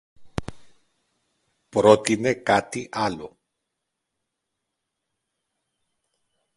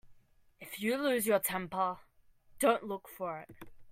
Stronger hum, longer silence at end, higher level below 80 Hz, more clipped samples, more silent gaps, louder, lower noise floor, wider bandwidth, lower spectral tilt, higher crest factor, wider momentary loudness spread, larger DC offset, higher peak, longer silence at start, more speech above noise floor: neither; first, 3.3 s vs 0 s; first, -54 dBFS vs -68 dBFS; neither; neither; first, -21 LUFS vs -33 LUFS; first, -81 dBFS vs -63 dBFS; second, 11.5 kHz vs 16 kHz; first, -5 dB/octave vs -3.5 dB/octave; first, 26 dB vs 20 dB; first, 20 LU vs 17 LU; neither; first, -2 dBFS vs -16 dBFS; first, 0.2 s vs 0.05 s; first, 60 dB vs 30 dB